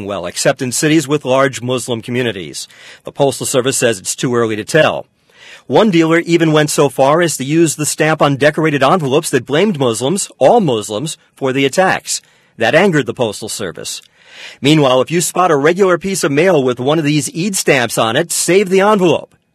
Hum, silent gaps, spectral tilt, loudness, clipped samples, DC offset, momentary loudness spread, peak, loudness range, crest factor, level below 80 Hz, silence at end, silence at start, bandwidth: none; none; -4.5 dB/octave; -13 LUFS; 0.1%; under 0.1%; 10 LU; 0 dBFS; 4 LU; 14 dB; -56 dBFS; 0.3 s; 0 s; 14 kHz